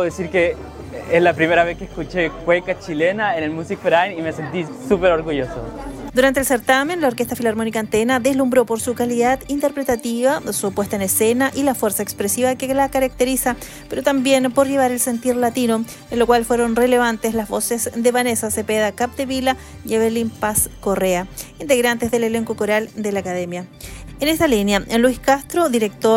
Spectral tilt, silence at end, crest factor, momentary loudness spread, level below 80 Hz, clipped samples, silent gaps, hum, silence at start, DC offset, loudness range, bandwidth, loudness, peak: -4 dB/octave; 0 s; 18 dB; 9 LU; -42 dBFS; under 0.1%; none; none; 0 s; under 0.1%; 2 LU; 16.5 kHz; -19 LUFS; -2 dBFS